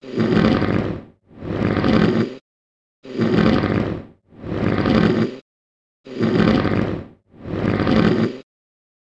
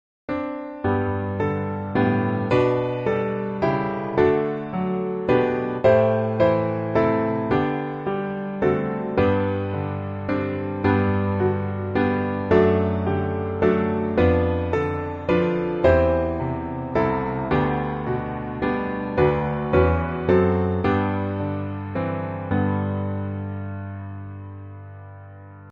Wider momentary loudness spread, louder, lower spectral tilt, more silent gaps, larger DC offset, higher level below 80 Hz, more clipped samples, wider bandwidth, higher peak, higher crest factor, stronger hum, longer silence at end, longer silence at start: first, 16 LU vs 10 LU; first, -19 LUFS vs -23 LUFS; second, -8 dB/octave vs -9.5 dB/octave; first, 2.41-3.03 s, 5.41-6.04 s vs none; neither; about the same, -40 dBFS vs -42 dBFS; neither; first, 7.8 kHz vs 6.8 kHz; first, 0 dBFS vs -4 dBFS; about the same, 20 dB vs 18 dB; neither; first, 0.6 s vs 0 s; second, 0 s vs 0.3 s